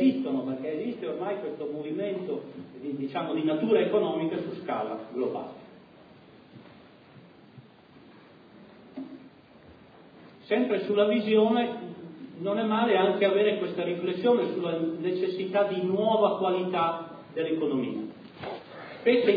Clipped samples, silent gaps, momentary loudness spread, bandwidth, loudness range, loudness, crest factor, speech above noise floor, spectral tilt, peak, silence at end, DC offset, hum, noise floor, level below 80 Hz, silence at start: under 0.1%; none; 17 LU; 5 kHz; 15 LU; -28 LUFS; 18 dB; 28 dB; -9 dB/octave; -10 dBFS; 0 s; under 0.1%; none; -54 dBFS; -76 dBFS; 0 s